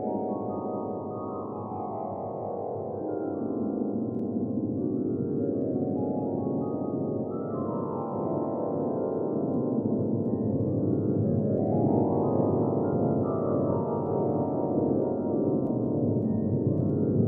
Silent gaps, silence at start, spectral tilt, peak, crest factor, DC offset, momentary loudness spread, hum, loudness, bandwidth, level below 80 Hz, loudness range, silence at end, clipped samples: none; 0 s; -15 dB/octave; -12 dBFS; 16 dB; under 0.1%; 8 LU; none; -29 LUFS; 2.2 kHz; -60 dBFS; 6 LU; 0 s; under 0.1%